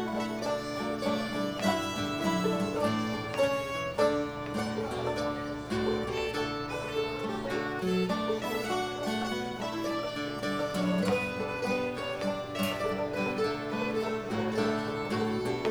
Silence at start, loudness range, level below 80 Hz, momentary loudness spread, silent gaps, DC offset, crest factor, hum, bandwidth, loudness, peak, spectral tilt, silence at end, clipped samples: 0 s; 2 LU; -56 dBFS; 4 LU; none; under 0.1%; 18 dB; none; over 20 kHz; -31 LUFS; -14 dBFS; -5 dB/octave; 0 s; under 0.1%